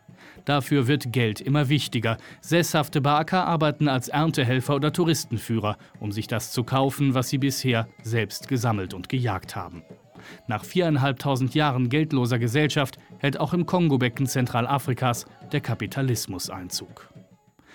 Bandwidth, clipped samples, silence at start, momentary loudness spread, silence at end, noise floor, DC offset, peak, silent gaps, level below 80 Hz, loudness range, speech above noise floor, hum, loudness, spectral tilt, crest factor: 19 kHz; under 0.1%; 0.2 s; 10 LU; 0.5 s; -56 dBFS; under 0.1%; -8 dBFS; none; -60 dBFS; 4 LU; 32 dB; none; -25 LUFS; -5.5 dB/octave; 16 dB